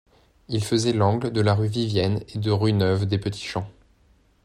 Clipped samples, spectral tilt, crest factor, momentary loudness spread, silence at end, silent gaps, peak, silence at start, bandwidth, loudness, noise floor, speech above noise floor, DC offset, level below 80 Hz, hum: under 0.1%; -6.5 dB/octave; 16 dB; 9 LU; 0.75 s; none; -8 dBFS; 0.5 s; 12 kHz; -23 LUFS; -60 dBFS; 37 dB; under 0.1%; -54 dBFS; none